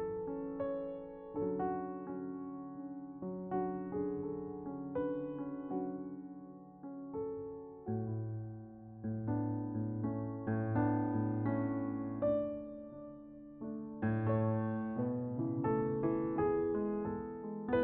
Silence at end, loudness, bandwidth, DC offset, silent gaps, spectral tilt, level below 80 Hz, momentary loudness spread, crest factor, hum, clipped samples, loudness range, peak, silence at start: 0 s; -38 LUFS; 3.7 kHz; under 0.1%; none; -9.5 dB/octave; -64 dBFS; 14 LU; 16 dB; none; under 0.1%; 7 LU; -22 dBFS; 0 s